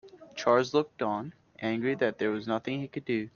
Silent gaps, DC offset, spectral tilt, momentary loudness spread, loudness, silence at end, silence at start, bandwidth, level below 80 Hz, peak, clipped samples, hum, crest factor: none; under 0.1%; -6 dB/octave; 11 LU; -30 LUFS; 0.05 s; 0.05 s; 7.2 kHz; -70 dBFS; -10 dBFS; under 0.1%; none; 20 dB